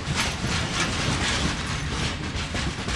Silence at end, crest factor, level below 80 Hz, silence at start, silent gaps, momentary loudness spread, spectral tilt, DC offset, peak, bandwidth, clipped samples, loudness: 0 s; 16 dB; -36 dBFS; 0 s; none; 4 LU; -3.5 dB/octave; under 0.1%; -10 dBFS; 11.5 kHz; under 0.1%; -26 LUFS